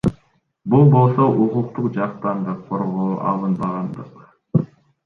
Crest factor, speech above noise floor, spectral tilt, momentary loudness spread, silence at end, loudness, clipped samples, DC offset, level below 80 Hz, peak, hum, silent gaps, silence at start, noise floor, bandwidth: 16 dB; 42 dB; -11 dB/octave; 14 LU; 0.4 s; -19 LUFS; under 0.1%; under 0.1%; -52 dBFS; -2 dBFS; none; none; 0.05 s; -60 dBFS; 4.4 kHz